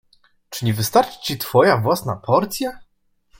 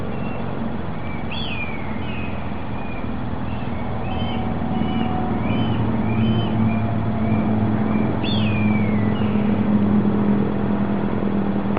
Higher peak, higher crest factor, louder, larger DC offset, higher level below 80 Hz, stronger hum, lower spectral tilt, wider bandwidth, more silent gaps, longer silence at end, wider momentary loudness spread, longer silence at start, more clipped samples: about the same, -2 dBFS vs -4 dBFS; about the same, 20 dB vs 18 dB; first, -19 LUFS vs -22 LUFS; second, under 0.1% vs 4%; second, -54 dBFS vs -38 dBFS; neither; second, -5 dB/octave vs -6.5 dB/octave; first, 17 kHz vs 4.9 kHz; neither; first, 0.55 s vs 0 s; about the same, 11 LU vs 9 LU; first, 0.5 s vs 0 s; neither